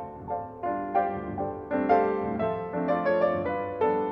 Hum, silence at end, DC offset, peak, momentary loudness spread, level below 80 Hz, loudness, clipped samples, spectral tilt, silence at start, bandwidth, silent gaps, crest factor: none; 0 s; under 0.1%; -10 dBFS; 9 LU; -56 dBFS; -28 LUFS; under 0.1%; -9.5 dB/octave; 0 s; 5.8 kHz; none; 18 dB